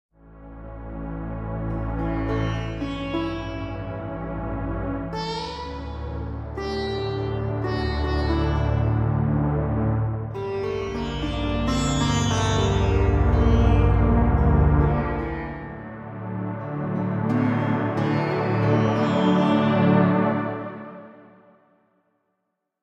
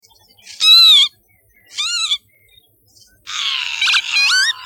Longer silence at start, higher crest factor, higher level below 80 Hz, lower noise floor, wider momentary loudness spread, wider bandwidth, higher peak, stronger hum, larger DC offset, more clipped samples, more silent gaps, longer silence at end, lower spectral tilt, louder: second, 0.25 s vs 0.5 s; about the same, 18 dB vs 16 dB; first, -30 dBFS vs -64 dBFS; first, -78 dBFS vs -55 dBFS; second, 13 LU vs 16 LU; second, 8.4 kHz vs 17 kHz; second, -6 dBFS vs 0 dBFS; neither; neither; neither; neither; first, 1.6 s vs 0 s; first, -7 dB/octave vs 5 dB/octave; second, -24 LUFS vs -11 LUFS